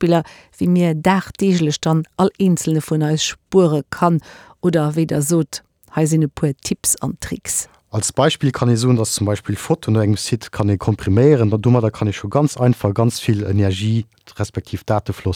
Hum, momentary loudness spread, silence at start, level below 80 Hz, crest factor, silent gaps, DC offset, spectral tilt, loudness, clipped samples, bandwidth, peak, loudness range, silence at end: none; 8 LU; 0 s; -48 dBFS; 16 dB; none; under 0.1%; -5.5 dB/octave; -18 LUFS; under 0.1%; 19 kHz; -2 dBFS; 3 LU; 0 s